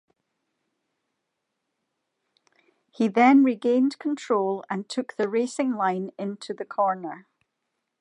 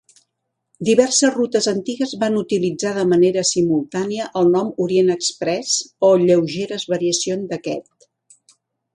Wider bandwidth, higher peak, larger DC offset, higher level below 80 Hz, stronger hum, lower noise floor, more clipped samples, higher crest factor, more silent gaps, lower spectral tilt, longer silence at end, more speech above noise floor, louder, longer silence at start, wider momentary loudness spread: about the same, 10.5 kHz vs 11.5 kHz; second, -6 dBFS vs 0 dBFS; neither; second, -84 dBFS vs -64 dBFS; neither; first, -80 dBFS vs -76 dBFS; neither; about the same, 20 dB vs 18 dB; neither; first, -6 dB/octave vs -4 dB/octave; second, 0.8 s vs 1.15 s; about the same, 57 dB vs 58 dB; second, -24 LUFS vs -18 LUFS; first, 3 s vs 0.8 s; first, 15 LU vs 9 LU